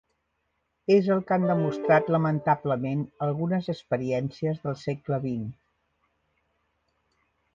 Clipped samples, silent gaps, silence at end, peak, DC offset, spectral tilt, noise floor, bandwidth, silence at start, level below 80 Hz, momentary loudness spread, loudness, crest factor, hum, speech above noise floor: under 0.1%; none; 2 s; -8 dBFS; under 0.1%; -8.5 dB/octave; -76 dBFS; 7.4 kHz; 0.9 s; -64 dBFS; 10 LU; -26 LUFS; 18 dB; none; 51 dB